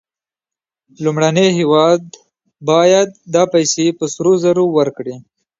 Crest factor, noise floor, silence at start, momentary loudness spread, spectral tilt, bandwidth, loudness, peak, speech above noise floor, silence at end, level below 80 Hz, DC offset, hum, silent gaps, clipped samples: 14 dB; -89 dBFS; 1 s; 8 LU; -5 dB/octave; 7.8 kHz; -14 LUFS; 0 dBFS; 75 dB; 0.4 s; -62 dBFS; under 0.1%; none; none; under 0.1%